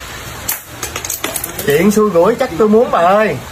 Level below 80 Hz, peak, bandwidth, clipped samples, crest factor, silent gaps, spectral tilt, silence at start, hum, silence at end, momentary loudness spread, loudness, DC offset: -40 dBFS; 0 dBFS; 16 kHz; under 0.1%; 14 dB; none; -4.5 dB/octave; 0 s; none; 0 s; 11 LU; -13 LUFS; under 0.1%